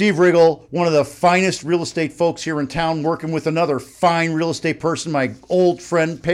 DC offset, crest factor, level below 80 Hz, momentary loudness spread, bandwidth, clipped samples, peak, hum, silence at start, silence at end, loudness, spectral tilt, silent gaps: under 0.1%; 14 dB; -52 dBFS; 7 LU; 13.5 kHz; under 0.1%; -4 dBFS; none; 0 s; 0 s; -18 LUFS; -5.5 dB/octave; none